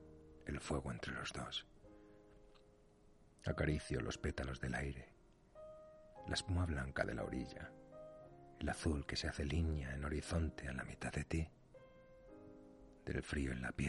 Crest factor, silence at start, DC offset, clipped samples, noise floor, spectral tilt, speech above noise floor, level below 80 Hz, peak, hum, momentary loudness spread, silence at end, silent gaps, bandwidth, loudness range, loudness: 22 dB; 0 s; under 0.1%; under 0.1%; -67 dBFS; -5.5 dB/octave; 25 dB; -52 dBFS; -22 dBFS; none; 21 LU; 0 s; none; 11.5 kHz; 4 LU; -43 LUFS